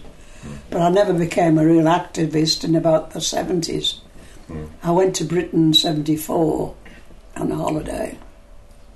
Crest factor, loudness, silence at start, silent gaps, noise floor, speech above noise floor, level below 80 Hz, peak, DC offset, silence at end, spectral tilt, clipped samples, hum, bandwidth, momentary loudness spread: 14 dB; -19 LUFS; 0 s; none; -42 dBFS; 24 dB; -42 dBFS; -6 dBFS; under 0.1%; 0.35 s; -5 dB/octave; under 0.1%; none; 12.5 kHz; 18 LU